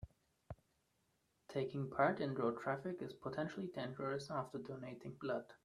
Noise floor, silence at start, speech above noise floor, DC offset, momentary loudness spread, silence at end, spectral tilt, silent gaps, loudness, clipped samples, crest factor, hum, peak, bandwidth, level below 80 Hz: -81 dBFS; 0 s; 39 dB; under 0.1%; 18 LU; 0.1 s; -7 dB/octave; none; -42 LUFS; under 0.1%; 22 dB; none; -20 dBFS; 12.5 kHz; -72 dBFS